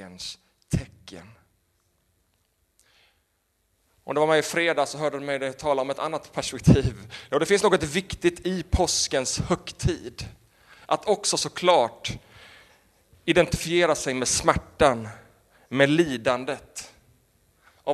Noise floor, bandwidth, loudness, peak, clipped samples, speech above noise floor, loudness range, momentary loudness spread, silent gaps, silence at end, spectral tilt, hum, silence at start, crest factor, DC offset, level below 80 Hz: -71 dBFS; 13.5 kHz; -24 LUFS; -2 dBFS; under 0.1%; 47 dB; 5 LU; 16 LU; none; 0 s; -4 dB/octave; none; 0 s; 24 dB; under 0.1%; -44 dBFS